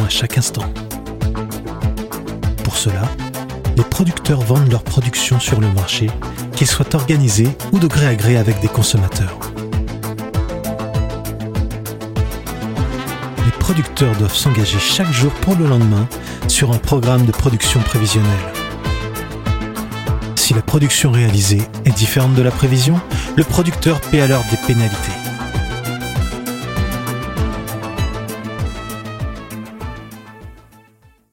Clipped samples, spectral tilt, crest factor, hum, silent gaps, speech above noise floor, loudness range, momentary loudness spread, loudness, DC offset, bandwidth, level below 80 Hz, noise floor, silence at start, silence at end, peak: under 0.1%; -5 dB/octave; 16 dB; none; none; 36 dB; 8 LU; 12 LU; -17 LUFS; under 0.1%; 17 kHz; -30 dBFS; -51 dBFS; 0 s; 0.75 s; 0 dBFS